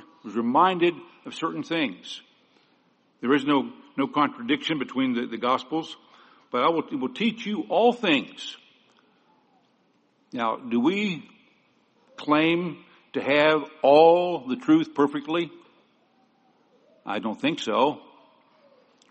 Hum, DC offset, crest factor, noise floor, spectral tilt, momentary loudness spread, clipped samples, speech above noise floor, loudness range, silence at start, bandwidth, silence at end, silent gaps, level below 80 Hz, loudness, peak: none; under 0.1%; 22 dB; -66 dBFS; -5.5 dB/octave; 16 LU; under 0.1%; 42 dB; 9 LU; 0.25 s; 8.4 kHz; 1.1 s; none; -74 dBFS; -24 LUFS; -4 dBFS